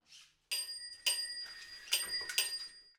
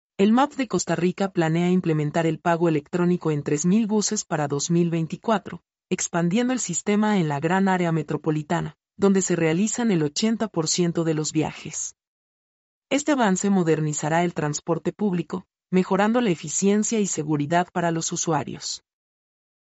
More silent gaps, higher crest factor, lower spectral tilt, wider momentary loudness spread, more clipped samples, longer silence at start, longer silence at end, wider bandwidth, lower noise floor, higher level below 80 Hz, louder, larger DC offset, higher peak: second, none vs 12.07-12.82 s; first, 24 dB vs 16 dB; second, 3.5 dB/octave vs -5 dB/octave; first, 9 LU vs 6 LU; neither; about the same, 0.1 s vs 0.2 s; second, 0.1 s vs 0.9 s; first, over 20 kHz vs 8.2 kHz; second, -62 dBFS vs under -90 dBFS; second, -76 dBFS vs -64 dBFS; second, -36 LUFS vs -23 LUFS; neither; second, -16 dBFS vs -8 dBFS